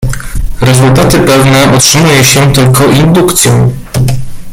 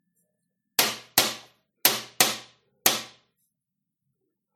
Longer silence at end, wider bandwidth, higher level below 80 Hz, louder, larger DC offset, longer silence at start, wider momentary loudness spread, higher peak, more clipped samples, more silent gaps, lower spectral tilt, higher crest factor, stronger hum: second, 0 s vs 1.45 s; first, over 20 kHz vs 18 kHz; first, -20 dBFS vs -72 dBFS; first, -5 LUFS vs -24 LUFS; neither; second, 0 s vs 0.8 s; second, 9 LU vs 12 LU; about the same, 0 dBFS vs -2 dBFS; first, 0.6% vs under 0.1%; neither; first, -4.5 dB/octave vs 0 dB/octave; second, 6 dB vs 26 dB; neither